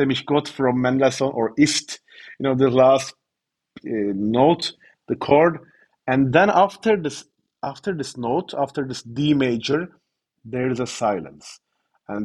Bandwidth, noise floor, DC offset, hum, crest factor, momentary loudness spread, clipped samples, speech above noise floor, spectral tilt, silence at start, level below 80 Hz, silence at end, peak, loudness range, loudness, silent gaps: 12 kHz; -82 dBFS; under 0.1%; none; 20 dB; 16 LU; under 0.1%; 62 dB; -5 dB/octave; 0 s; -58 dBFS; 0 s; -2 dBFS; 5 LU; -21 LUFS; none